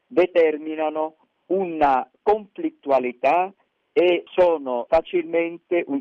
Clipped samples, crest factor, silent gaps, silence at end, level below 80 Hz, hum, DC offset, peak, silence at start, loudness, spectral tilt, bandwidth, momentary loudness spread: under 0.1%; 14 dB; none; 0 s; -54 dBFS; none; under 0.1%; -8 dBFS; 0.1 s; -22 LUFS; -7 dB/octave; 6.4 kHz; 7 LU